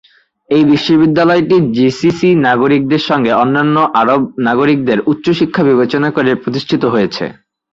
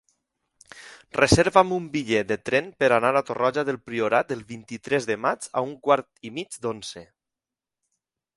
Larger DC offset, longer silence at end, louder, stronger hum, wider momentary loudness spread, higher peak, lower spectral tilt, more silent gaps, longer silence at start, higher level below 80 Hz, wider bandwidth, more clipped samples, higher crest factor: neither; second, 0.4 s vs 1.35 s; first, -12 LUFS vs -23 LUFS; neither; second, 5 LU vs 17 LU; about the same, 0 dBFS vs -2 dBFS; first, -7 dB/octave vs -4.5 dB/octave; neither; second, 0.5 s vs 0.75 s; about the same, -50 dBFS vs -50 dBFS; second, 7.6 kHz vs 11.5 kHz; neither; second, 12 dB vs 24 dB